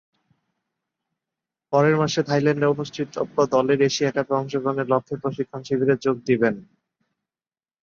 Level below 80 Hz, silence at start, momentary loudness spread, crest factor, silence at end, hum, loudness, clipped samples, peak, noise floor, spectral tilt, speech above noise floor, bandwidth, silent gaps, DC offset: -64 dBFS; 1.7 s; 9 LU; 18 dB; 1.2 s; none; -22 LUFS; under 0.1%; -6 dBFS; under -90 dBFS; -6 dB/octave; over 69 dB; 7.4 kHz; none; under 0.1%